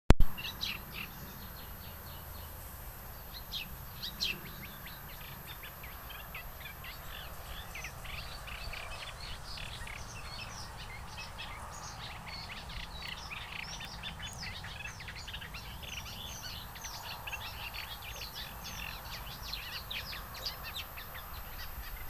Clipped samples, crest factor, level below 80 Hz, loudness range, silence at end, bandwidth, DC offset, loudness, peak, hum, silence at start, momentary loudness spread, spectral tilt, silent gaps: under 0.1%; 36 dB; -42 dBFS; 3 LU; 0 s; over 20 kHz; under 0.1%; -42 LUFS; -2 dBFS; none; 0.1 s; 7 LU; -3.5 dB/octave; none